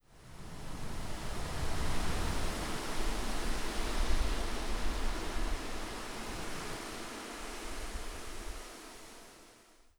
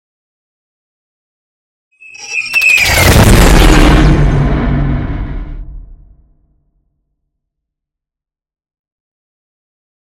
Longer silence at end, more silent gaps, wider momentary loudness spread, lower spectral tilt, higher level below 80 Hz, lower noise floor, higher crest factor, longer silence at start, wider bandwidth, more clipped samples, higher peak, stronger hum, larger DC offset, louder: second, 0.45 s vs 4.2 s; neither; second, 13 LU vs 19 LU; about the same, -4 dB/octave vs -4.5 dB/octave; second, -38 dBFS vs -16 dBFS; second, -61 dBFS vs -86 dBFS; first, 18 dB vs 12 dB; second, 0.1 s vs 2.2 s; about the same, 17 kHz vs 17.5 kHz; second, under 0.1% vs 0.2%; second, -18 dBFS vs 0 dBFS; neither; neither; second, -40 LUFS vs -9 LUFS